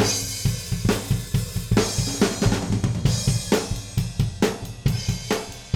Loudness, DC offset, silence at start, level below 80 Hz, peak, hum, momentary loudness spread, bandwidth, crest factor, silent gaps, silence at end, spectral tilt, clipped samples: -24 LUFS; under 0.1%; 0 s; -34 dBFS; -8 dBFS; none; 5 LU; 18 kHz; 14 dB; none; 0 s; -4.5 dB/octave; under 0.1%